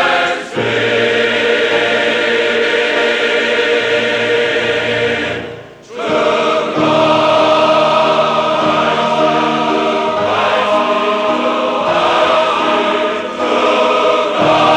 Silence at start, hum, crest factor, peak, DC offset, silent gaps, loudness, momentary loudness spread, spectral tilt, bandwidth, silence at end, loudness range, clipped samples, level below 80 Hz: 0 s; none; 12 dB; 0 dBFS; under 0.1%; none; -13 LUFS; 5 LU; -4 dB/octave; 10.5 kHz; 0 s; 2 LU; under 0.1%; -52 dBFS